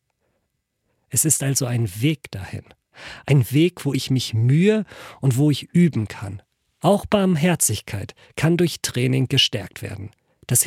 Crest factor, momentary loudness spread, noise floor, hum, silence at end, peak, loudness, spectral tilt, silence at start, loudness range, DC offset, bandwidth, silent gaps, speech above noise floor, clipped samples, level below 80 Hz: 18 dB; 17 LU; -74 dBFS; none; 0 s; -4 dBFS; -20 LUFS; -4.5 dB/octave; 1.1 s; 2 LU; under 0.1%; 16.5 kHz; none; 54 dB; under 0.1%; -52 dBFS